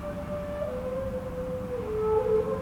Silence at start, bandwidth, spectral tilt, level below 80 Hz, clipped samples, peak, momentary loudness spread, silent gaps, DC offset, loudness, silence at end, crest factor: 0 s; 17 kHz; -8 dB/octave; -44 dBFS; under 0.1%; -14 dBFS; 9 LU; none; under 0.1%; -30 LUFS; 0 s; 14 dB